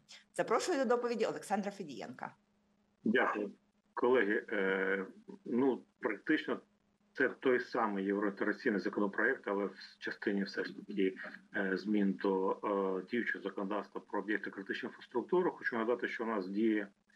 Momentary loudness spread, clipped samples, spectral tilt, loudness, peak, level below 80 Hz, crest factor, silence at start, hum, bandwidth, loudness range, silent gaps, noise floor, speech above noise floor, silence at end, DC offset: 10 LU; under 0.1%; -5.5 dB/octave; -35 LUFS; -18 dBFS; under -90 dBFS; 18 dB; 0.1 s; none; 12.5 kHz; 2 LU; none; -75 dBFS; 39 dB; 0.25 s; under 0.1%